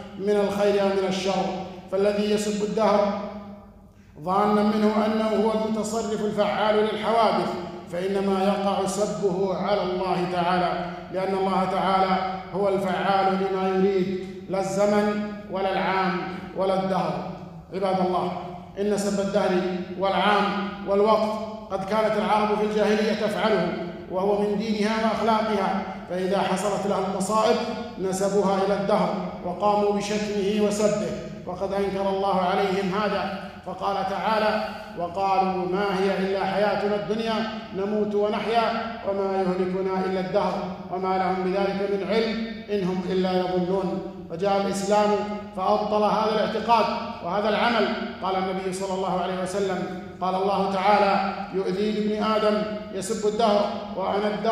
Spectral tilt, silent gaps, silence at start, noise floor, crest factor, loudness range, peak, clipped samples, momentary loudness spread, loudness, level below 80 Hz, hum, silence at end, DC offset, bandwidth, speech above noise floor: -5.5 dB/octave; none; 0 s; -49 dBFS; 18 dB; 2 LU; -6 dBFS; under 0.1%; 9 LU; -24 LUFS; -54 dBFS; none; 0 s; under 0.1%; 15 kHz; 25 dB